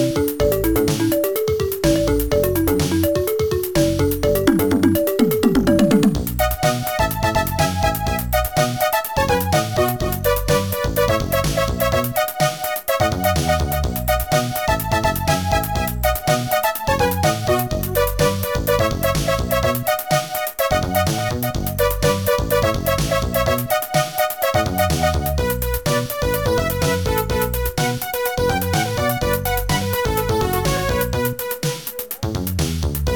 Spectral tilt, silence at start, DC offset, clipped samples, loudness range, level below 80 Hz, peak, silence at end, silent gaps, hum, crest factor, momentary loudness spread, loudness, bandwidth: -5 dB/octave; 0 s; 0.4%; under 0.1%; 3 LU; -30 dBFS; -4 dBFS; 0 s; none; none; 16 dB; 4 LU; -19 LUFS; over 20 kHz